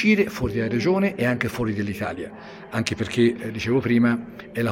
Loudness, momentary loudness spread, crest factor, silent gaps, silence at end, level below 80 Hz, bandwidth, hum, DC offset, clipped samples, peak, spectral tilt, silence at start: -23 LUFS; 11 LU; 20 dB; none; 0 s; -50 dBFS; 16.5 kHz; none; under 0.1%; under 0.1%; -2 dBFS; -6.5 dB/octave; 0 s